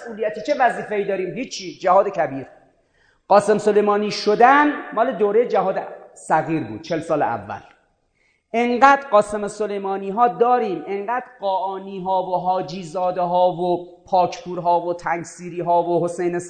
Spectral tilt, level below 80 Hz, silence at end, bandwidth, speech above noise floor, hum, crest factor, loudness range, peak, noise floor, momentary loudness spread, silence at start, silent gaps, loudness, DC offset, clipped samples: -5.5 dB/octave; -60 dBFS; 0 s; 9.4 kHz; 45 dB; none; 20 dB; 5 LU; 0 dBFS; -65 dBFS; 12 LU; 0 s; none; -20 LUFS; under 0.1%; under 0.1%